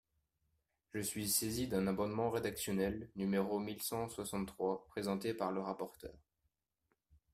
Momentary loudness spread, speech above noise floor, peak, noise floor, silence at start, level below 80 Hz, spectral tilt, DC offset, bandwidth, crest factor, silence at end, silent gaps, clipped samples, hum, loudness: 8 LU; 46 dB; -20 dBFS; -85 dBFS; 0.95 s; -66 dBFS; -4.5 dB/octave; under 0.1%; 16 kHz; 20 dB; 1.15 s; none; under 0.1%; none; -39 LUFS